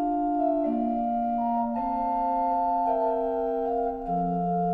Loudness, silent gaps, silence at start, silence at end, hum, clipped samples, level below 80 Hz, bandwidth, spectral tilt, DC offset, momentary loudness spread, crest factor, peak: -27 LUFS; none; 0 s; 0 s; none; under 0.1%; -50 dBFS; 4.7 kHz; -11 dB/octave; under 0.1%; 3 LU; 12 dB; -14 dBFS